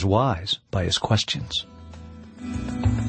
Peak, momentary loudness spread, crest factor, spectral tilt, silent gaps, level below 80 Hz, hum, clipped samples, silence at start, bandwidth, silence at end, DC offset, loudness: -6 dBFS; 20 LU; 20 dB; -5 dB/octave; none; -40 dBFS; none; under 0.1%; 0 s; 8.8 kHz; 0 s; under 0.1%; -25 LUFS